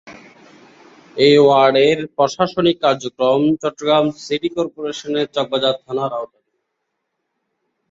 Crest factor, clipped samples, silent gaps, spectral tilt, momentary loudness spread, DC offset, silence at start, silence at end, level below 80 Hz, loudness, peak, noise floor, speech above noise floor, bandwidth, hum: 16 dB; under 0.1%; none; -5 dB/octave; 12 LU; under 0.1%; 0.05 s; 1.65 s; -58 dBFS; -17 LUFS; -2 dBFS; -75 dBFS; 59 dB; 7.8 kHz; none